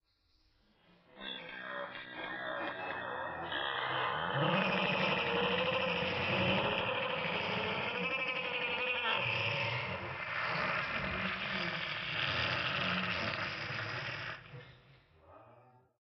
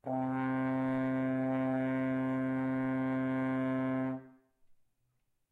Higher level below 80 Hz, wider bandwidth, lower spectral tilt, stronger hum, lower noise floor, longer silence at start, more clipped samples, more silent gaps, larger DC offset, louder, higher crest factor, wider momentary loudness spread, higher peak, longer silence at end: first, -64 dBFS vs -72 dBFS; first, 6.2 kHz vs 3.9 kHz; second, -2 dB/octave vs -9.5 dB/octave; neither; second, -73 dBFS vs -78 dBFS; first, 1.15 s vs 0.05 s; neither; neither; neither; about the same, -34 LUFS vs -34 LUFS; first, 20 dB vs 12 dB; first, 11 LU vs 2 LU; first, -18 dBFS vs -22 dBFS; second, 0.4 s vs 0.8 s